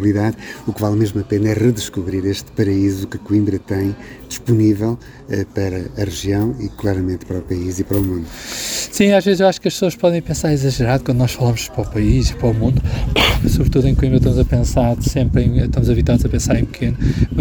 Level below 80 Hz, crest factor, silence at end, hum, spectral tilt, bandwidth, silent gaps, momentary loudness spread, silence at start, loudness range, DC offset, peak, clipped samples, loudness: -26 dBFS; 16 dB; 0 s; none; -6 dB/octave; over 20 kHz; none; 8 LU; 0 s; 5 LU; under 0.1%; 0 dBFS; under 0.1%; -17 LUFS